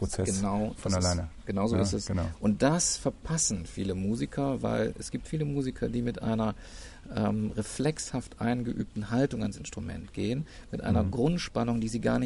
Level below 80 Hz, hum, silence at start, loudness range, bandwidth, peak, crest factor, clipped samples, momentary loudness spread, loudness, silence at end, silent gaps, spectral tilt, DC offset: -44 dBFS; none; 0 s; 3 LU; 11.5 kHz; -10 dBFS; 20 dB; under 0.1%; 8 LU; -30 LUFS; 0 s; none; -5 dB/octave; under 0.1%